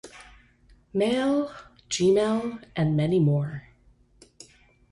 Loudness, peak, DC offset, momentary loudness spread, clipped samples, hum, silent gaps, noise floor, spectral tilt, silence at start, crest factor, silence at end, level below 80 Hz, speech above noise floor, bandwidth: -25 LUFS; -12 dBFS; under 0.1%; 14 LU; under 0.1%; none; none; -59 dBFS; -6.5 dB/octave; 0.05 s; 16 dB; 1.3 s; -56 dBFS; 35 dB; 11.5 kHz